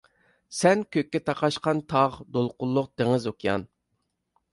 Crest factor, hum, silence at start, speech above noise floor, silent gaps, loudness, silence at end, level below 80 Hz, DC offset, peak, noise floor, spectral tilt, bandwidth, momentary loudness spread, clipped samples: 20 dB; none; 0.5 s; 52 dB; none; -26 LUFS; 0.85 s; -60 dBFS; under 0.1%; -6 dBFS; -77 dBFS; -5.5 dB/octave; 11.5 kHz; 7 LU; under 0.1%